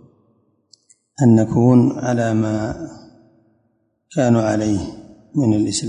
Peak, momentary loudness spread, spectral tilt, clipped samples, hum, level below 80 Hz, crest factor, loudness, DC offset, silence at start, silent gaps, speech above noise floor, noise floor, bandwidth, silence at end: -2 dBFS; 13 LU; -7 dB/octave; under 0.1%; none; -46 dBFS; 18 dB; -17 LUFS; under 0.1%; 1.2 s; none; 50 dB; -66 dBFS; 10.5 kHz; 0 s